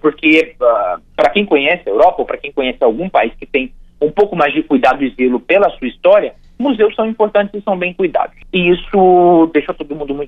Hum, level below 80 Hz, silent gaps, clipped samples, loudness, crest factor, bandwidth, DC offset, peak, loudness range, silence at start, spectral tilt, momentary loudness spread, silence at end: none; -40 dBFS; none; under 0.1%; -13 LUFS; 12 dB; 7.8 kHz; under 0.1%; 0 dBFS; 2 LU; 0.05 s; -7 dB/octave; 9 LU; 0 s